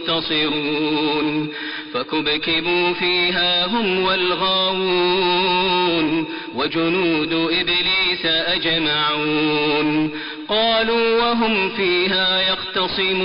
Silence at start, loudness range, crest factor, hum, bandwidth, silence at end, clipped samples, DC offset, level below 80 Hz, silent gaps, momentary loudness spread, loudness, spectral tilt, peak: 0 s; 2 LU; 10 dB; none; 5.4 kHz; 0 s; under 0.1%; under 0.1%; -50 dBFS; none; 6 LU; -18 LUFS; -1.5 dB/octave; -8 dBFS